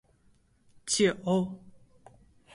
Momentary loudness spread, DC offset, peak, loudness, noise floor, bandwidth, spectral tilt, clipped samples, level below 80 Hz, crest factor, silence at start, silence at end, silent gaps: 19 LU; under 0.1%; -14 dBFS; -28 LUFS; -65 dBFS; 11.5 kHz; -4 dB/octave; under 0.1%; -64 dBFS; 20 dB; 0.85 s; 0.85 s; none